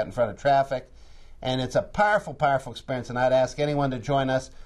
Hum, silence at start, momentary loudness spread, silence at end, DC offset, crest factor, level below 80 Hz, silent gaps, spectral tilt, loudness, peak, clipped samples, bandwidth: none; 0 s; 8 LU; 0 s; under 0.1%; 16 dB; -46 dBFS; none; -5.5 dB/octave; -25 LUFS; -8 dBFS; under 0.1%; 12 kHz